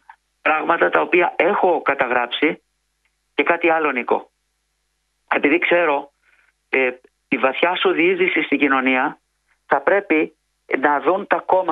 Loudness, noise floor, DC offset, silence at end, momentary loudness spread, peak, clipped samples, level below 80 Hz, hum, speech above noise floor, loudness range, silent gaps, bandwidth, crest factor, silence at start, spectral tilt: -18 LUFS; -70 dBFS; under 0.1%; 0 s; 7 LU; 0 dBFS; under 0.1%; -68 dBFS; none; 52 dB; 3 LU; none; 4.7 kHz; 20 dB; 0.45 s; -6.5 dB/octave